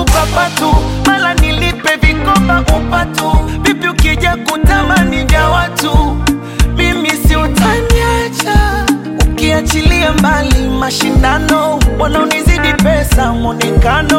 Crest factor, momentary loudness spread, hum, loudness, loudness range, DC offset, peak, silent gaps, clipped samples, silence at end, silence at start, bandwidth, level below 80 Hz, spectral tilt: 10 dB; 4 LU; none; -11 LUFS; 1 LU; under 0.1%; 0 dBFS; none; under 0.1%; 0 s; 0 s; 17 kHz; -14 dBFS; -5 dB/octave